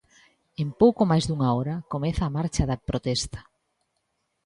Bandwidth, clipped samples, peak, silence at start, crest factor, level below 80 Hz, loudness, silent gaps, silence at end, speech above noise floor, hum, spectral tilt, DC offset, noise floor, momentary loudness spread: 11 kHz; under 0.1%; -6 dBFS; 0.6 s; 20 dB; -42 dBFS; -25 LUFS; none; 1.05 s; 52 dB; none; -6.5 dB/octave; under 0.1%; -76 dBFS; 12 LU